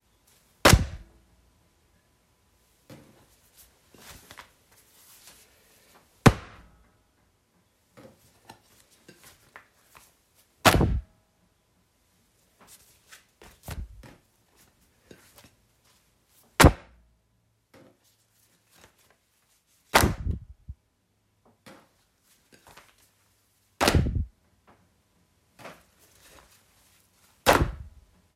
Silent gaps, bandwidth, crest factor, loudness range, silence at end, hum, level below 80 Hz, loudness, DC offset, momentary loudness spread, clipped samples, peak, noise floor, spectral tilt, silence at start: none; 16 kHz; 28 dB; 21 LU; 0.5 s; none; -40 dBFS; -23 LUFS; under 0.1%; 30 LU; under 0.1%; -2 dBFS; -71 dBFS; -4.5 dB/octave; 0.65 s